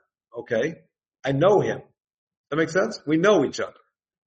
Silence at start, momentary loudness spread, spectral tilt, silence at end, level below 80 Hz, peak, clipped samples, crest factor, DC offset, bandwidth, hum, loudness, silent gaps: 0.35 s; 15 LU; -6 dB/octave; 0.55 s; -64 dBFS; -6 dBFS; under 0.1%; 20 dB; under 0.1%; 8.4 kHz; none; -23 LUFS; 2.14-2.31 s, 2.37-2.44 s